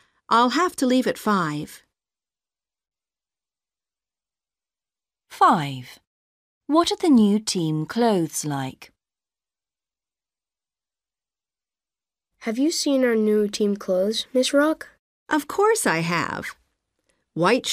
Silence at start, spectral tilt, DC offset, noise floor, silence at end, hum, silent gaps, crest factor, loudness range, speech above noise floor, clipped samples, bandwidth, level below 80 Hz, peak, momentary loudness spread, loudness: 0.3 s; -4.5 dB/octave; under 0.1%; under -90 dBFS; 0 s; none; 6.07-6.61 s, 14.99-15.26 s; 18 dB; 9 LU; over 69 dB; under 0.1%; 15.5 kHz; -66 dBFS; -6 dBFS; 13 LU; -21 LUFS